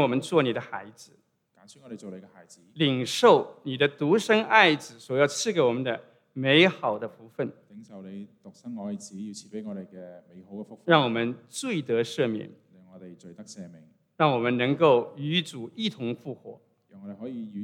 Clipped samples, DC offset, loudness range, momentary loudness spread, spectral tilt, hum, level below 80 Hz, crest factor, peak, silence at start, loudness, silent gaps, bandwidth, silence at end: under 0.1%; under 0.1%; 9 LU; 24 LU; -5 dB/octave; none; -84 dBFS; 24 dB; -2 dBFS; 0 s; -25 LUFS; none; 15.5 kHz; 0 s